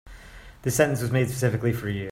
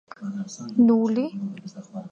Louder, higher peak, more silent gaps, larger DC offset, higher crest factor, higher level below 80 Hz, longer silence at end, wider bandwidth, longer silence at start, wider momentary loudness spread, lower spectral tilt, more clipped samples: about the same, -25 LUFS vs -23 LUFS; first, -4 dBFS vs -8 dBFS; neither; neither; first, 22 dB vs 16 dB; first, -48 dBFS vs -70 dBFS; about the same, 0 s vs 0 s; first, 16 kHz vs 7.4 kHz; second, 0.05 s vs 0.2 s; second, 6 LU vs 19 LU; second, -5.5 dB/octave vs -7 dB/octave; neither